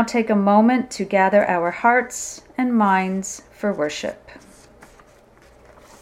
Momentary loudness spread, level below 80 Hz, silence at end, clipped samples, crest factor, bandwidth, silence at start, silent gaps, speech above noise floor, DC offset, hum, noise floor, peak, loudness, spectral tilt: 13 LU; -56 dBFS; 1.7 s; under 0.1%; 18 dB; 14.5 kHz; 0 s; none; 31 dB; under 0.1%; none; -50 dBFS; -2 dBFS; -19 LUFS; -5 dB/octave